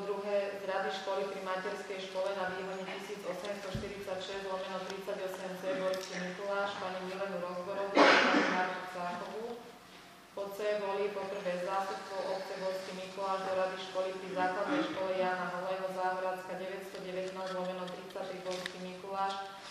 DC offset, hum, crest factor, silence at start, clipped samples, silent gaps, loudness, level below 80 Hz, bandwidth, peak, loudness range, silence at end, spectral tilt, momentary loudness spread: under 0.1%; none; 24 dB; 0 s; under 0.1%; none; -35 LUFS; -70 dBFS; 15 kHz; -10 dBFS; 8 LU; 0 s; -4 dB/octave; 9 LU